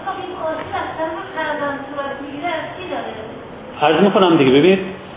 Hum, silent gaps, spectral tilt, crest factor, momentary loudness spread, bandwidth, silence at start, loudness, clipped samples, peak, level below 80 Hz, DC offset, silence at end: none; none; -10 dB/octave; 18 dB; 15 LU; 3.9 kHz; 0 s; -18 LUFS; under 0.1%; 0 dBFS; -50 dBFS; under 0.1%; 0 s